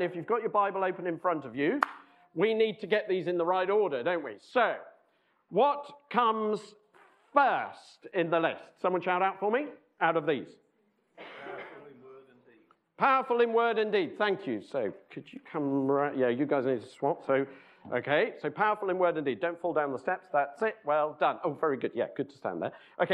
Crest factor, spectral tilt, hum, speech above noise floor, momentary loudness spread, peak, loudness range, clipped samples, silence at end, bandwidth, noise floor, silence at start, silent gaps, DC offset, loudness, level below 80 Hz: 24 dB; -7 dB/octave; none; 42 dB; 10 LU; -6 dBFS; 3 LU; under 0.1%; 0 s; 9.4 kHz; -72 dBFS; 0 s; none; under 0.1%; -30 LUFS; -84 dBFS